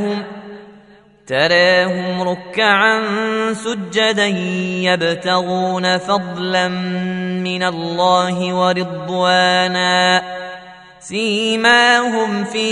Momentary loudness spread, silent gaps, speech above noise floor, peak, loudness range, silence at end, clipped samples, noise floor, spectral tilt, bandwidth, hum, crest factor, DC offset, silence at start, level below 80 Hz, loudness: 10 LU; none; 30 dB; 0 dBFS; 3 LU; 0 s; under 0.1%; -46 dBFS; -4 dB/octave; 11 kHz; none; 16 dB; under 0.1%; 0 s; -60 dBFS; -16 LUFS